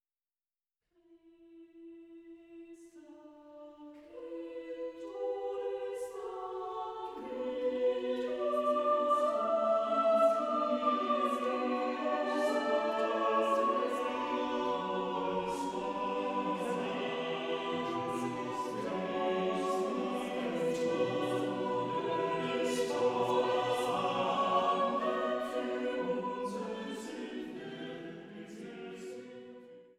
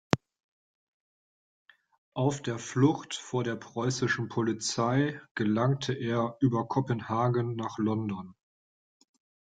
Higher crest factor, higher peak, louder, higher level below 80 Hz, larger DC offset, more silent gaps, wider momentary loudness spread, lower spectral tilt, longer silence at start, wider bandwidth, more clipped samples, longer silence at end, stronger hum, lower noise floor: second, 16 dB vs 30 dB; second, -18 dBFS vs -2 dBFS; second, -33 LUFS vs -30 LUFS; second, -72 dBFS vs -66 dBFS; neither; second, none vs 0.44-1.66 s, 1.98-2.12 s, 5.31-5.35 s; first, 17 LU vs 7 LU; about the same, -5 dB/octave vs -6 dB/octave; first, 1.1 s vs 0.15 s; first, 14 kHz vs 9.4 kHz; neither; second, 0.15 s vs 1.25 s; neither; about the same, under -90 dBFS vs under -90 dBFS